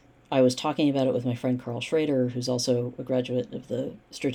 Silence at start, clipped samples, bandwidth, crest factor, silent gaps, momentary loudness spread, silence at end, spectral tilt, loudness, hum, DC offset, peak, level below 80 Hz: 0.3 s; under 0.1%; 13.5 kHz; 16 dB; none; 9 LU; 0 s; -6 dB/octave; -27 LUFS; none; under 0.1%; -10 dBFS; -64 dBFS